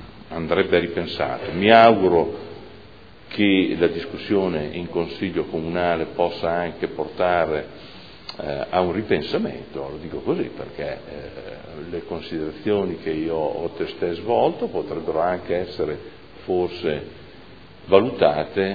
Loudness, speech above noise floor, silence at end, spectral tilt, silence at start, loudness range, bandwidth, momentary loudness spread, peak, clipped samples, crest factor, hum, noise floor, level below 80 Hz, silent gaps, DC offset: -22 LUFS; 24 dB; 0 s; -8 dB/octave; 0 s; 9 LU; 5 kHz; 16 LU; 0 dBFS; under 0.1%; 22 dB; none; -46 dBFS; -50 dBFS; none; 0.4%